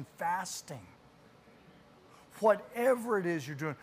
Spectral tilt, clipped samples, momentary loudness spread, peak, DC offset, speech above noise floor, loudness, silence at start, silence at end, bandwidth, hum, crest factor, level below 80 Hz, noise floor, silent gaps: -5 dB/octave; under 0.1%; 13 LU; -14 dBFS; under 0.1%; 27 dB; -32 LUFS; 0 s; 0.05 s; 15.5 kHz; none; 22 dB; -76 dBFS; -60 dBFS; none